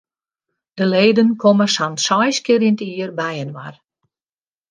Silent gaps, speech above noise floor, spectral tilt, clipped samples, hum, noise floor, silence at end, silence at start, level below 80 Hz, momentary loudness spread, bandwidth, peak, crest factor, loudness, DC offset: none; over 74 dB; -4.5 dB/octave; under 0.1%; none; under -90 dBFS; 1 s; 0.75 s; -66 dBFS; 14 LU; 10 kHz; -2 dBFS; 16 dB; -16 LUFS; under 0.1%